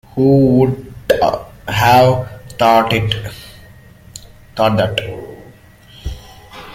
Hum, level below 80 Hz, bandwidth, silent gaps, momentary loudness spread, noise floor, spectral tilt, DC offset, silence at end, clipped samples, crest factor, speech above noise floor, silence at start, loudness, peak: none; -38 dBFS; 16.5 kHz; none; 24 LU; -42 dBFS; -6 dB/octave; under 0.1%; 0 s; under 0.1%; 16 dB; 30 dB; 0.15 s; -14 LUFS; 0 dBFS